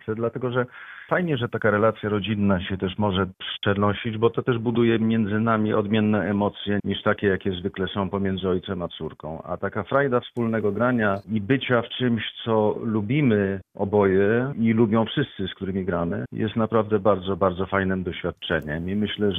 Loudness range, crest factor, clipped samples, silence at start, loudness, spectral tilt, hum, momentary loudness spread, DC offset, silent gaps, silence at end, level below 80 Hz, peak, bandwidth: 3 LU; 18 dB; under 0.1%; 0.05 s; -24 LUFS; -9.5 dB/octave; none; 8 LU; under 0.1%; none; 0 s; -56 dBFS; -6 dBFS; 3.9 kHz